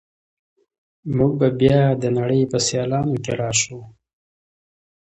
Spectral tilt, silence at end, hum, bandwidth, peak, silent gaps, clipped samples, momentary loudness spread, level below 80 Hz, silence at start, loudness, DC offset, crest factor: -5 dB/octave; 1.15 s; none; 8.8 kHz; -2 dBFS; none; under 0.1%; 10 LU; -50 dBFS; 1.05 s; -19 LUFS; under 0.1%; 20 dB